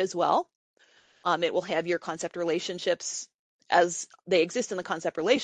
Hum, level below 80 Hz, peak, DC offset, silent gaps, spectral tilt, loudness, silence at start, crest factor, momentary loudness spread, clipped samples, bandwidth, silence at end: none; -76 dBFS; -8 dBFS; under 0.1%; 0.55-0.74 s, 3.34-3.59 s; -3 dB/octave; -28 LUFS; 0 s; 20 dB; 10 LU; under 0.1%; 9.8 kHz; 0 s